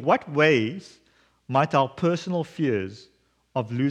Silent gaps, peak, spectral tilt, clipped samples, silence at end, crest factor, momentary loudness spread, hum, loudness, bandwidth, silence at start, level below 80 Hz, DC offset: none; -6 dBFS; -6.5 dB/octave; under 0.1%; 0 s; 20 dB; 12 LU; none; -24 LUFS; 9.8 kHz; 0 s; -68 dBFS; under 0.1%